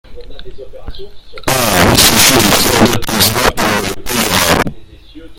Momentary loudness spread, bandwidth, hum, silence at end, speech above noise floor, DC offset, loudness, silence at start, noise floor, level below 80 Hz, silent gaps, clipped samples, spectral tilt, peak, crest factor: 10 LU; over 20 kHz; none; 0.05 s; 21 dB; under 0.1%; -10 LUFS; 0.1 s; -33 dBFS; -28 dBFS; none; 0.6%; -2.5 dB/octave; 0 dBFS; 12 dB